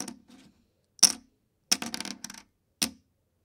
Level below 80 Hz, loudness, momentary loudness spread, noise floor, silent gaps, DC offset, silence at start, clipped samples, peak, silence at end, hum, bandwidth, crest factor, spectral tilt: -72 dBFS; -26 LUFS; 20 LU; -68 dBFS; none; under 0.1%; 0 s; under 0.1%; 0 dBFS; 0.55 s; none; 17.5 kHz; 32 dB; 0.5 dB/octave